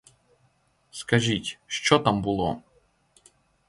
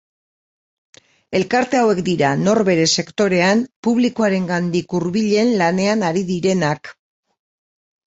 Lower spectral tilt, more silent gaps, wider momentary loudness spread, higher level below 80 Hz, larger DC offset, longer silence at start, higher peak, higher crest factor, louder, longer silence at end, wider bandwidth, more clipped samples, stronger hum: about the same, -4.5 dB/octave vs -5 dB/octave; second, none vs 3.76-3.83 s; first, 18 LU vs 5 LU; about the same, -54 dBFS vs -58 dBFS; neither; second, 0.95 s vs 1.3 s; about the same, -4 dBFS vs -2 dBFS; first, 24 dB vs 16 dB; second, -24 LUFS vs -17 LUFS; about the same, 1.1 s vs 1.2 s; first, 11.5 kHz vs 8 kHz; neither; neither